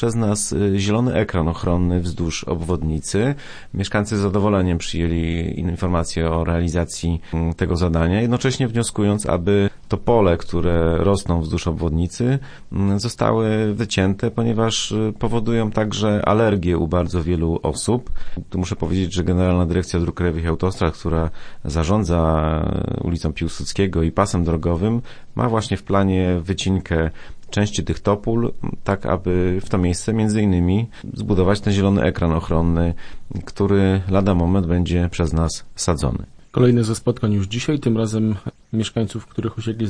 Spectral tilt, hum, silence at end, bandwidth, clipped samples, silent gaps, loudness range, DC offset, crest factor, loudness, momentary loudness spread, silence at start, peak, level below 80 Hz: -6.5 dB/octave; none; 0 s; 10.5 kHz; under 0.1%; none; 2 LU; under 0.1%; 18 dB; -20 LUFS; 7 LU; 0 s; -2 dBFS; -32 dBFS